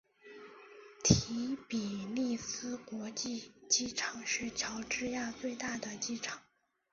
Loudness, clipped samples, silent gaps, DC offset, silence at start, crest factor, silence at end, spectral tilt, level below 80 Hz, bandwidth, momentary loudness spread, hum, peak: -36 LUFS; under 0.1%; none; under 0.1%; 0.25 s; 28 dB; 0.5 s; -4 dB/octave; -58 dBFS; 7.6 kHz; 21 LU; none; -10 dBFS